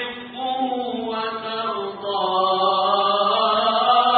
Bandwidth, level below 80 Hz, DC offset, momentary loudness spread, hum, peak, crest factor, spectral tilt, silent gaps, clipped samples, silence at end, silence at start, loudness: 4.7 kHz; -64 dBFS; under 0.1%; 8 LU; none; -4 dBFS; 16 dB; -8.5 dB/octave; none; under 0.1%; 0 s; 0 s; -21 LUFS